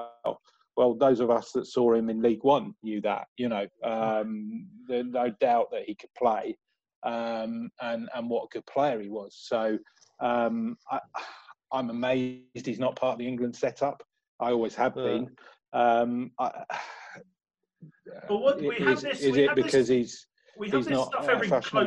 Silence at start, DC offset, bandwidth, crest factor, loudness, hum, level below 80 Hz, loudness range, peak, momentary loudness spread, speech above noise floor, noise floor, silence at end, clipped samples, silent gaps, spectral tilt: 0 s; under 0.1%; 10 kHz; 20 dB; -28 LUFS; none; -68 dBFS; 5 LU; -8 dBFS; 14 LU; 22 dB; -50 dBFS; 0 s; under 0.1%; 3.28-3.36 s, 6.96-7.02 s, 14.28-14.39 s; -5.5 dB/octave